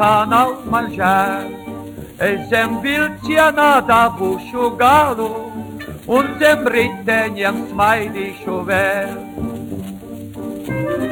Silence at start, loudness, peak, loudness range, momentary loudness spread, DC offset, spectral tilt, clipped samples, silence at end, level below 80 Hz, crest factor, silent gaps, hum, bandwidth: 0 s; -16 LUFS; -2 dBFS; 5 LU; 17 LU; under 0.1%; -5 dB/octave; under 0.1%; 0 s; -46 dBFS; 16 dB; none; none; over 20 kHz